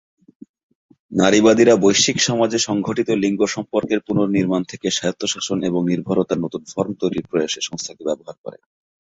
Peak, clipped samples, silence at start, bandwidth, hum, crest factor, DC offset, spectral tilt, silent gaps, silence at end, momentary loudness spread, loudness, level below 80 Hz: -2 dBFS; under 0.1%; 1.1 s; 8 kHz; none; 18 dB; under 0.1%; -4 dB/octave; 8.38-8.44 s; 0.5 s; 13 LU; -19 LUFS; -56 dBFS